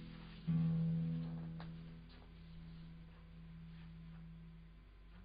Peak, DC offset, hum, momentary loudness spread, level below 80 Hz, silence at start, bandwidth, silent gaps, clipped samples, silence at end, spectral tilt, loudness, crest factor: -30 dBFS; under 0.1%; none; 21 LU; -60 dBFS; 0 s; 5 kHz; none; under 0.1%; 0 s; -9 dB/octave; -43 LUFS; 16 dB